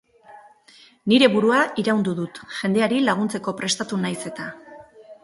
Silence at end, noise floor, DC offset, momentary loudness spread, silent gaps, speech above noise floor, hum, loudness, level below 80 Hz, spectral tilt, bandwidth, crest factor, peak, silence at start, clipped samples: 0.1 s; -52 dBFS; under 0.1%; 15 LU; none; 31 dB; none; -21 LUFS; -66 dBFS; -4.5 dB/octave; 11.5 kHz; 20 dB; -2 dBFS; 0.3 s; under 0.1%